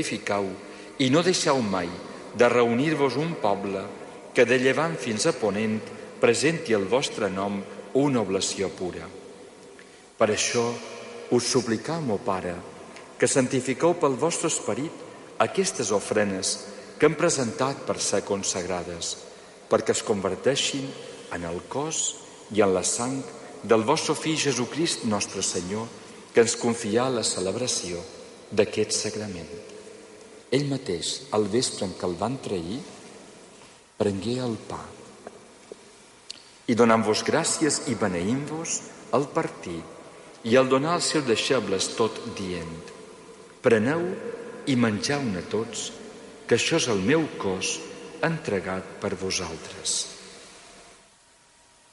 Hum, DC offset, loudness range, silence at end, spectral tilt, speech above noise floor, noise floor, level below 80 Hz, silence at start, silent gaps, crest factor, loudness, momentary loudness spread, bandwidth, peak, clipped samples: none; under 0.1%; 5 LU; 1 s; -3.5 dB/octave; 32 dB; -57 dBFS; -58 dBFS; 0 s; none; 20 dB; -25 LUFS; 19 LU; 11.5 kHz; -8 dBFS; under 0.1%